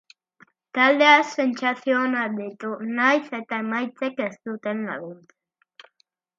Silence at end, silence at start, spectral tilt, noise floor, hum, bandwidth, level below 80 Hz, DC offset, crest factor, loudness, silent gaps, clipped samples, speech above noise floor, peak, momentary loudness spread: 1.25 s; 0.75 s; -4 dB/octave; -68 dBFS; none; 7.6 kHz; -80 dBFS; under 0.1%; 22 dB; -22 LUFS; none; under 0.1%; 46 dB; -2 dBFS; 16 LU